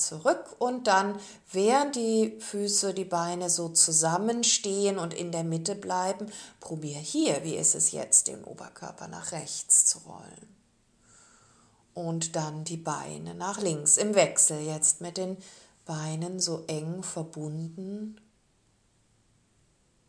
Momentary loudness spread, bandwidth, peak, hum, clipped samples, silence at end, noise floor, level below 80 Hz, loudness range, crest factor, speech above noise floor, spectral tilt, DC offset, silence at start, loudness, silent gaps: 18 LU; 11 kHz; -8 dBFS; none; under 0.1%; 1.95 s; -67 dBFS; -74 dBFS; 10 LU; 22 dB; 39 dB; -2.5 dB/octave; under 0.1%; 0 s; -26 LUFS; none